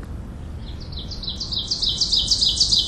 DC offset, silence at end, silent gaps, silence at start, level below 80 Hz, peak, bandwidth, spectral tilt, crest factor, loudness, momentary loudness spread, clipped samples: under 0.1%; 0 s; none; 0 s; -34 dBFS; -4 dBFS; 13.5 kHz; -2 dB/octave; 20 dB; -19 LUFS; 19 LU; under 0.1%